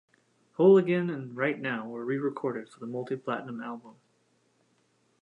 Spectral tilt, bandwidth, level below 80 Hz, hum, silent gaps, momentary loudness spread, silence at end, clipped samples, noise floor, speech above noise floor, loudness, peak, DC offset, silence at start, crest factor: -8.5 dB/octave; 8.2 kHz; -82 dBFS; none; none; 18 LU; 1.3 s; under 0.1%; -70 dBFS; 42 dB; -28 LUFS; -10 dBFS; under 0.1%; 0.6 s; 20 dB